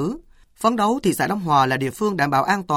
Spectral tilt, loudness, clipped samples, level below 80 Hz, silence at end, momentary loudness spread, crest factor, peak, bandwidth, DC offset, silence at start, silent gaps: -5 dB/octave; -20 LUFS; under 0.1%; -52 dBFS; 0 s; 5 LU; 16 dB; -4 dBFS; 18 kHz; under 0.1%; 0 s; none